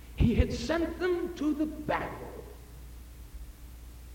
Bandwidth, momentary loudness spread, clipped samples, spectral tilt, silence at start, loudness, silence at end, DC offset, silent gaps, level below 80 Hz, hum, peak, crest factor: 17 kHz; 21 LU; under 0.1%; -7 dB/octave; 0 s; -31 LUFS; 0 s; under 0.1%; none; -40 dBFS; none; -10 dBFS; 22 dB